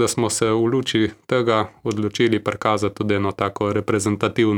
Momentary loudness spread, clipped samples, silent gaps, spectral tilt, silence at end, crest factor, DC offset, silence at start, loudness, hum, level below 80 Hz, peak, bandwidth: 4 LU; under 0.1%; none; -5 dB/octave; 0 s; 18 dB; under 0.1%; 0 s; -21 LUFS; none; -54 dBFS; -2 dBFS; 18 kHz